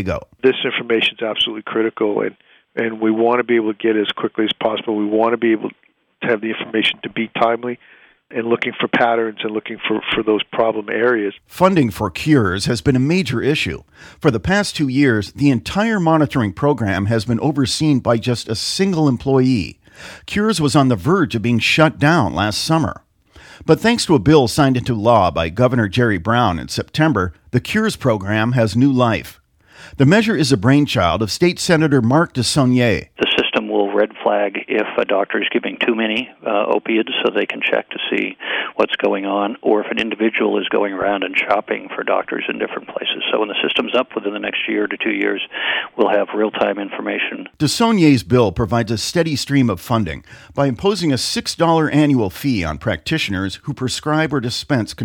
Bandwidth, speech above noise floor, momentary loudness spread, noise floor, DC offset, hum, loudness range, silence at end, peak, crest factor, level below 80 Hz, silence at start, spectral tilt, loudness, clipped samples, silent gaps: 18 kHz; 28 dB; 8 LU; -45 dBFS; under 0.1%; none; 4 LU; 0 s; 0 dBFS; 16 dB; -44 dBFS; 0 s; -5.5 dB/octave; -17 LUFS; under 0.1%; none